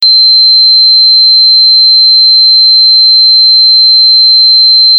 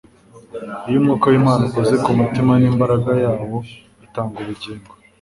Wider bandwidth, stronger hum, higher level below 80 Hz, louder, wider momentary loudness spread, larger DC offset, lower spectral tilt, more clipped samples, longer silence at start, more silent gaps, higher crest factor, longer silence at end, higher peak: second, 5 kHz vs 11.5 kHz; neither; second, -78 dBFS vs -48 dBFS; first, 0 LUFS vs -17 LUFS; second, 0 LU vs 18 LU; neither; second, 3.5 dB/octave vs -8 dB/octave; neither; second, 0 s vs 0.35 s; neither; second, 4 dB vs 16 dB; second, 0 s vs 0.4 s; about the same, 0 dBFS vs -2 dBFS